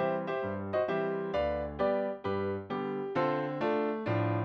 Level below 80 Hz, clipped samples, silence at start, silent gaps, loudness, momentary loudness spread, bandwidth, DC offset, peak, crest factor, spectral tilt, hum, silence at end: -56 dBFS; under 0.1%; 0 s; none; -33 LUFS; 4 LU; 6.6 kHz; under 0.1%; -18 dBFS; 14 dB; -9 dB/octave; none; 0 s